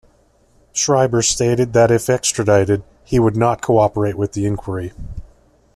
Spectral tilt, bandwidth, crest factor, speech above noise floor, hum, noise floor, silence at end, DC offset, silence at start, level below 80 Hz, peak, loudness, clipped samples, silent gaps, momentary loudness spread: -5 dB/octave; 14 kHz; 16 dB; 39 dB; none; -55 dBFS; 0.5 s; under 0.1%; 0.75 s; -40 dBFS; -2 dBFS; -17 LUFS; under 0.1%; none; 12 LU